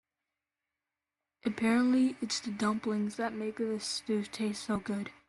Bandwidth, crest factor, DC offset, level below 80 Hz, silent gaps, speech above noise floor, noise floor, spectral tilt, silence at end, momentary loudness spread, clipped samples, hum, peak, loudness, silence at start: 12 kHz; 16 dB; under 0.1%; -70 dBFS; none; 58 dB; -90 dBFS; -4.5 dB/octave; 0.2 s; 8 LU; under 0.1%; none; -16 dBFS; -32 LUFS; 1.45 s